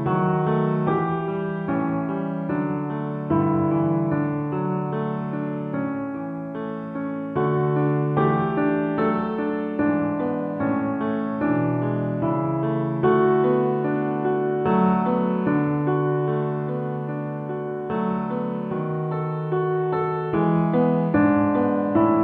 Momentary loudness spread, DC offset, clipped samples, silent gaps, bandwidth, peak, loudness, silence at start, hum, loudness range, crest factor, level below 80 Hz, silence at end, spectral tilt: 8 LU; under 0.1%; under 0.1%; none; 4.3 kHz; -8 dBFS; -23 LUFS; 0 s; none; 5 LU; 16 dB; -56 dBFS; 0 s; -11.5 dB/octave